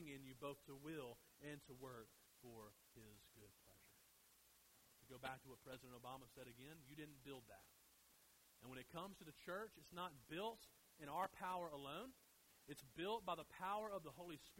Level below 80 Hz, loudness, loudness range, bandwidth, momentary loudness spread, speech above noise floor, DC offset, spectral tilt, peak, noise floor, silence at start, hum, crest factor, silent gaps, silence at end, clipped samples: -80 dBFS; -54 LUFS; 11 LU; 16 kHz; 18 LU; 20 dB; under 0.1%; -4.5 dB/octave; -32 dBFS; -74 dBFS; 0 s; none; 22 dB; none; 0 s; under 0.1%